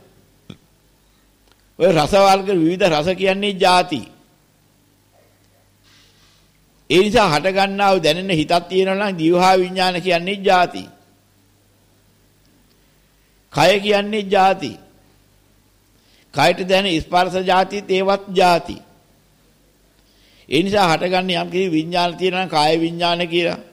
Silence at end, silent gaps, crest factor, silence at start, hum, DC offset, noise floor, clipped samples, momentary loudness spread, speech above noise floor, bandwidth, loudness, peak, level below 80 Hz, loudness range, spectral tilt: 0.1 s; none; 14 dB; 1.8 s; 50 Hz at -50 dBFS; under 0.1%; -56 dBFS; under 0.1%; 6 LU; 40 dB; 16 kHz; -17 LUFS; -4 dBFS; -50 dBFS; 6 LU; -5 dB/octave